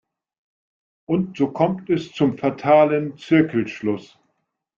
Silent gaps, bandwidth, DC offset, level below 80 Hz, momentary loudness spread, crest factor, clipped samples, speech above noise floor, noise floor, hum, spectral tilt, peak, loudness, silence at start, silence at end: none; 7.2 kHz; under 0.1%; -62 dBFS; 9 LU; 18 dB; under 0.1%; 54 dB; -74 dBFS; none; -8 dB/octave; -4 dBFS; -20 LUFS; 1.1 s; 0.75 s